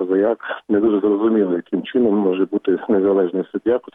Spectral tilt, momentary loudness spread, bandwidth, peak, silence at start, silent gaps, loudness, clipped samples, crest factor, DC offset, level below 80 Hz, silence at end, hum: -10 dB/octave; 5 LU; 3.8 kHz; -8 dBFS; 0 s; none; -18 LUFS; under 0.1%; 10 dB; under 0.1%; -60 dBFS; 0.05 s; none